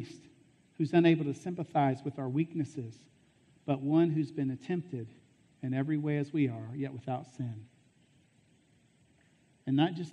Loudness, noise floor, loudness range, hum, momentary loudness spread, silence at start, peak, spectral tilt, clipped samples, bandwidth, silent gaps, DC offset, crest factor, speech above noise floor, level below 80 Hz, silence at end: -32 LUFS; -67 dBFS; 6 LU; none; 15 LU; 0 s; -14 dBFS; -8 dB/octave; under 0.1%; 9 kHz; none; under 0.1%; 20 dB; 35 dB; -76 dBFS; 0 s